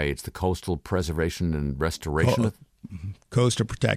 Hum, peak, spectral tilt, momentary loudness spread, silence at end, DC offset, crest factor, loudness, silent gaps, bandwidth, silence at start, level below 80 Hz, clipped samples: none; -8 dBFS; -5.5 dB/octave; 12 LU; 0 s; under 0.1%; 18 dB; -26 LUFS; none; 15.5 kHz; 0 s; -40 dBFS; under 0.1%